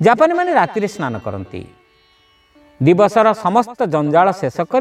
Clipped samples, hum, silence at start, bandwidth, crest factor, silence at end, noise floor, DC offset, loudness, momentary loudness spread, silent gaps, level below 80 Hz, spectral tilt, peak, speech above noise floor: under 0.1%; none; 0 s; 13 kHz; 16 dB; 0 s; -54 dBFS; under 0.1%; -15 LUFS; 14 LU; none; -56 dBFS; -7 dB/octave; 0 dBFS; 39 dB